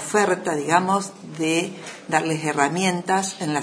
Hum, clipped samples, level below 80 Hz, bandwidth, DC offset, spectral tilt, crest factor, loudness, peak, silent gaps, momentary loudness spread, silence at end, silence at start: none; under 0.1%; -70 dBFS; 11 kHz; under 0.1%; -4 dB/octave; 20 dB; -22 LUFS; -2 dBFS; none; 7 LU; 0 s; 0 s